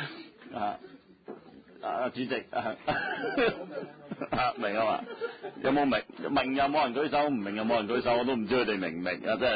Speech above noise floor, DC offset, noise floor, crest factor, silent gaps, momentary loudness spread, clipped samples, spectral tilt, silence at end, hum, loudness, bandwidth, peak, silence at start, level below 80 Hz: 21 dB; under 0.1%; -51 dBFS; 16 dB; none; 14 LU; under 0.1%; -9 dB/octave; 0 s; none; -30 LUFS; 5 kHz; -14 dBFS; 0 s; -60 dBFS